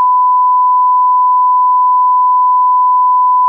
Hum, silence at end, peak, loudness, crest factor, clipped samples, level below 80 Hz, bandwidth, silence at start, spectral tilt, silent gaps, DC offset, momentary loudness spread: none; 0 s; -6 dBFS; -9 LUFS; 4 dB; under 0.1%; under -90 dBFS; 1.2 kHz; 0 s; 1.5 dB/octave; none; under 0.1%; 0 LU